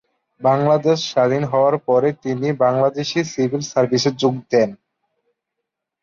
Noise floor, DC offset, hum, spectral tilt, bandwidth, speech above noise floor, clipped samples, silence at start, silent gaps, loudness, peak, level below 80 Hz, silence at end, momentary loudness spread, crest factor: -80 dBFS; under 0.1%; none; -5.5 dB/octave; 7.6 kHz; 63 dB; under 0.1%; 0.4 s; none; -18 LUFS; -4 dBFS; -60 dBFS; 1.3 s; 5 LU; 14 dB